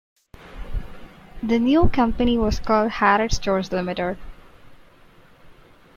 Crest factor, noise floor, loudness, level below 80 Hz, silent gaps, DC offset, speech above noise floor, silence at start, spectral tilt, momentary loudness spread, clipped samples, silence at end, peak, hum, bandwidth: 20 dB; -50 dBFS; -21 LUFS; -32 dBFS; none; under 0.1%; 31 dB; 0.45 s; -5.5 dB/octave; 17 LU; under 0.1%; 0.45 s; -4 dBFS; none; 7.4 kHz